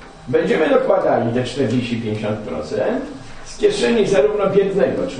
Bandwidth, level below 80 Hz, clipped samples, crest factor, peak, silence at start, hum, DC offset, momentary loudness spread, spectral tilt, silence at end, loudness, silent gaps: 10 kHz; -44 dBFS; under 0.1%; 16 dB; -2 dBFS; 0 s; none; under 0.1%; 10 LU; -6 dB/octave; 0 s; -18 LUFS; none